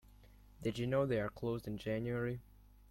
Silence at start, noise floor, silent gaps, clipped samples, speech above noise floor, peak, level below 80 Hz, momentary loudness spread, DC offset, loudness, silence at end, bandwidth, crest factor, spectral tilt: 0.25 s; -61 dBFS; none; under 0.1%; 23 dB; -22 dBFS; -60 dBFS; 8 LU; under 0.1%; -39 LUFS; 0.45 s; 16.5 kHz; 18 dB; -7.5 dB/octave